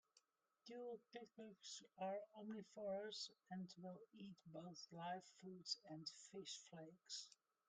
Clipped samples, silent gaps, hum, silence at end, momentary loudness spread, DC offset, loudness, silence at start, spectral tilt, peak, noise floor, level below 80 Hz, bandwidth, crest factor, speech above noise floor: under 0.1%; none; none; 0.35 s; 11 LU; under 0.1%; -54 LUFS; 0.15 s; -3.5 dB/octave; -32 dBFS; -82 dBFS; under -90 dBFS; 9.4 kHz; 24 dB; 27 dB